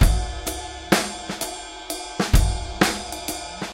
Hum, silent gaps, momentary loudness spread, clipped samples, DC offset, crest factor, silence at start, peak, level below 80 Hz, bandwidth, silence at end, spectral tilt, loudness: none; none; 10 LU; under 0.1%; under 0.1%; 22 dB; 0 s; 0 dBFS; -26 dBFS; 17 kHz; 0 s; -4 dB/octave; -25 LUFS